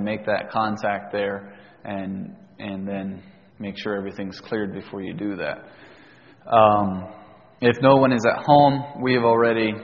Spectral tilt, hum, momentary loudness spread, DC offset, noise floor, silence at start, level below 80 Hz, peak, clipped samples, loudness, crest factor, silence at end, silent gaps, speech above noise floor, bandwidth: -5 dB/octave; none; 18 LU; under 0.1%; -50 dBFS; 0 s; -58 dBFS; 0 dBFS; under 0.1%; -21 LUFS; 22 dB; 0 s; none; 29 dB; 7 kHz